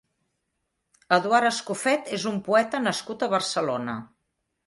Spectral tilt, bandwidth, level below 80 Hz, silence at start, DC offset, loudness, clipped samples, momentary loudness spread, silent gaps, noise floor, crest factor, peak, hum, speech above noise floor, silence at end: -3.5 dB/octave; 11.5 kHz; -70 dBFS; 1.1 s; under 0.1%; -25 LUFS; under 0.1%; 7 LU; none; -78 dBFS; 22 dB; -6 dBFS; none; 54 dB; 0.6 s